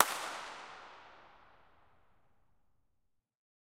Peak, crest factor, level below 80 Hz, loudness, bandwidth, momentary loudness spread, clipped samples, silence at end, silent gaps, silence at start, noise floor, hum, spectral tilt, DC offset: -4 dBFS; 38 dB; -78 dBFS; -39 LUFS; 16 kHz; 23 LU; under 0.1%; 2.35 s; none; 0 s; -80 dBFS; none; 0 dB/octave; under 0.1%